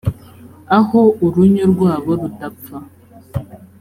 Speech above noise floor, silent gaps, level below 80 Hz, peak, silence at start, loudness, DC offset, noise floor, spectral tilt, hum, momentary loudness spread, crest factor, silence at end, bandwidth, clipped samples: 26 dB; none; -44 dBFS; -2 dBFS; 0.05 s; -14 LUFS; under 0.1%; -40 dBFS; -9 dB/octave; none; 19 LU; 14 dB; 0.15 s; 15.5 kHz; under 0.1%